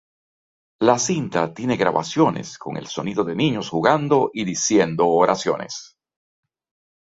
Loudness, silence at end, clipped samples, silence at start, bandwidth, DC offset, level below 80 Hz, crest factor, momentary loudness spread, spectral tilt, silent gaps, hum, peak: -20 LUFS; 1.2 s; under 0.1%; 0.8 s; 8 kHz; under 0.1%; -60 dBFS; 20 dB; 11 LU; -4.5 dB/octave; none; none; -2 dBFS